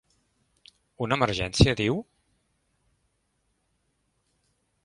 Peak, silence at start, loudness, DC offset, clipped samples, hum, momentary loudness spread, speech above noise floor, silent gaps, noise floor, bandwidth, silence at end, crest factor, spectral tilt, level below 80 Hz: -4 dBFS; 1 s; -25 LUFS; under 0.1%; under 0.1%; none; 11 LU; 50 dB; none; -74 dBFS; 11.5 kHz; 2.8 s; 26 dB; -5.5 dB/octave; -42 dBFS